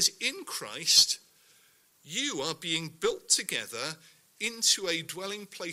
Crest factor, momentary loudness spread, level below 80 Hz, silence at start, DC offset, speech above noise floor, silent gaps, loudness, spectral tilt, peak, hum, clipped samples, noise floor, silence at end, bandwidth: 26 dB; 16 LU; -72 dBFS; 0 s; under 0.1%; 33 dB; none; -28 LUFS; -0.5 dB/octave; -6 dBFS; none; under 0.1%; -64 dBFS; 0 s; 16 kHz